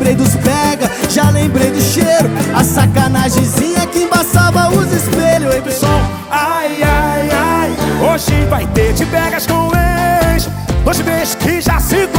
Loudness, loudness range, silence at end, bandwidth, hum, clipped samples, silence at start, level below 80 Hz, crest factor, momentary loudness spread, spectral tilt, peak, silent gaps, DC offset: -12 LUFS; 2 LU; 0 s; over 20 kHz; none; under 0.1%; 0 s; -22 dBFS; 12 dB; 4 LU; -5 dB/octave; 0 dBFS; none; under 0.1%